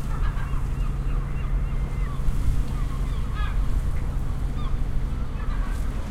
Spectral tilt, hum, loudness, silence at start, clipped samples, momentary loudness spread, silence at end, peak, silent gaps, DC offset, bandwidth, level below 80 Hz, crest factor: -7 dB/octave; none; -29 LUFS; 0 s; under 0.1%; 3 LU; 0 s; -10 dBFS; none; under 0.1%; 12.5 kHz; -24 dBFS; 14 dB